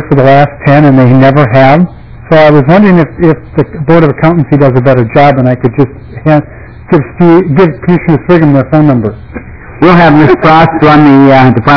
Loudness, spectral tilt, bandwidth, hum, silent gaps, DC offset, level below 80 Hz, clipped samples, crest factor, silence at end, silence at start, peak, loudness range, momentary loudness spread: -5 LUFS; -9.5 dB/octave; 5.4 kHz; none; none; 2%; -30 dBFS; 20%; 6 dB; 0 s; 0 s; 0 dBFS; 3 LU; 8 LU